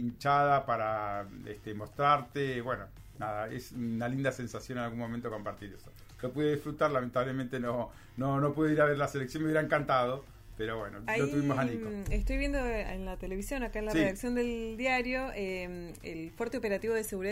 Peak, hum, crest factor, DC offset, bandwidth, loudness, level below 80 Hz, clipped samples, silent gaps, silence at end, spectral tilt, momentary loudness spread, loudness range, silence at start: -14 dBFS; none; 20 dB; under 0.1%; 16 kHz; -33 LUFS; -46 dBFS; under 0.1%; none; 0 s; -6 dB/octave; 14 LU; 5 LU; 0 s